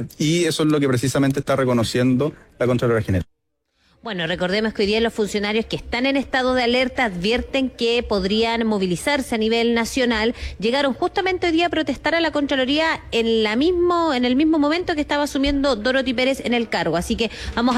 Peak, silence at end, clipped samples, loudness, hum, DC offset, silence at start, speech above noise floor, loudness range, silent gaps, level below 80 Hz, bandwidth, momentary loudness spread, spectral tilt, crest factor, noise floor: -8 dBFS; 0 s; under 0.1%; -20 LUFS; none; under 0.1%; 0 s; 50 dB; 3 LU; none; -42 dBFS; 16 kHz; 5 LU; -5 dB/octave; 12 dB; -70 dBFS